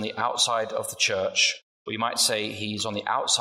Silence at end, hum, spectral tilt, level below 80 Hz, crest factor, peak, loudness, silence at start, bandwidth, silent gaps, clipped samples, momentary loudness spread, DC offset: 0 s; none; -1 dB/octave; -72 dBFS; 18 dB; -8 dBFS; -24 LUFS; 0 s; 16 kHz; 1.63-1.85 s; under 0.1%; 8 LU; under 0.1%